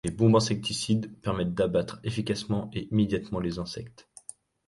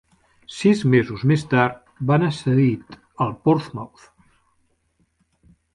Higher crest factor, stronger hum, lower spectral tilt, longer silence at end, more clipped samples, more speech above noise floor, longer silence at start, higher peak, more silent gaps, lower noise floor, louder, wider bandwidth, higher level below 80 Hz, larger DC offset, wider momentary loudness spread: about the same, 18 dB vs 18 dB; neither; second, -6 dB/octave vs -7.5 dB/octave; second, 0.65 s vs 1.9 s; neither; second, 22 dB vs 47 dB; second, 0.05 s vs 0.5 s; second, -10 dBFS vs -4 dBFS; neither; second, -49 dBFS vs -66 dBFS; second, -28 LUFS vs -20 LUFS; about the same, 11.5 kHz vs 11 kHz; about the same, -52 dBFS vs -56 dBFS; neither; first, 21 LU vs 15 LU